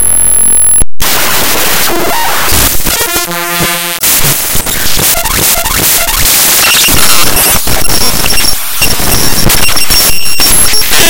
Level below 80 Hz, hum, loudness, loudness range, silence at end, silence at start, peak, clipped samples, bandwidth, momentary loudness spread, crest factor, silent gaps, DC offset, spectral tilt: -20 dBFS; none; -6 LUFS; 3 LU; 0 s; 0 s; 0 dBFS; 10%; over 20 kHz; 6 LU; 8 dB; none; under 0.1%; -1 dB/octave